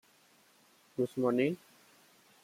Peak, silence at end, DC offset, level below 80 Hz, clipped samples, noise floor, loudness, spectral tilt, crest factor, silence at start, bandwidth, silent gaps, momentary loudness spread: -18 dBFS; 0.9 s; under 0.1%; -80 dBFS; under 0.1%; -66 dBFS; -34 LUFS; -7 dB/octave; 18 dB; 1 s; 16 kHz; none; 15 LU